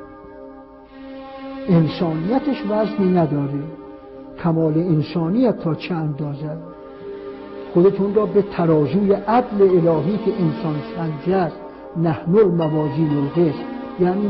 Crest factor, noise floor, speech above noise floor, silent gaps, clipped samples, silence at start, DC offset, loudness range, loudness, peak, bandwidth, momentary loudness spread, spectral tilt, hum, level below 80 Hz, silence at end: 14 dB; -41 dBFS; 23 dB; none; under 0.1%; 0 s; under 0.1%; 4 LU; -19 LUFS; -6 dBFS; 5.8 kHz; 20 LU; -12 dB/octave; none; -50 dBFS; 0 s